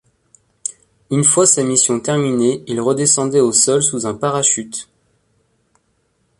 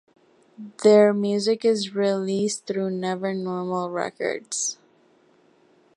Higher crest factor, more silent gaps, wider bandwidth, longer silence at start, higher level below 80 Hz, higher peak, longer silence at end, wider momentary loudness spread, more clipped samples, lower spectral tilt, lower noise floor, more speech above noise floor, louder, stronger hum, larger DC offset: about the same, 18 dB vs 20 dB; neither; about the same, 11.5 kHz vs 11.5 kHz; about the same, 0.65 s vs 0.6 s; first, -58 dBFS vs -74 dBFS; first, 0 dBFS vs -4 dBFS; first, 1.55 s vs 1.25 s; first, 16 LU vs 12 LU; neither; about the same, -3.5 dB/octave vs -4.5 dB/octave; first, -64 dBFS vs -59 dBFS; first, 48 dB vs 37 dB; first, -14 LUFS vs -23 LUFS; neither; neither